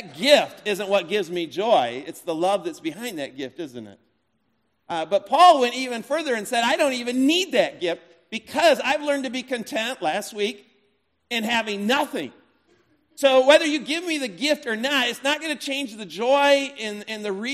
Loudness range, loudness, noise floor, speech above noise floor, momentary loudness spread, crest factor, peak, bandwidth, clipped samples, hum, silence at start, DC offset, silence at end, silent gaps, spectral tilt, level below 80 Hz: 6 LU; -22 LUFS; -71 dBFS; 49 dB; 14 LU; 20 dB; -2 dBFS; 14.5 kHz; under 0.1%; none; 0 s; under 0.1%; 0 s; none; -3 dB/octave; -76 dBFS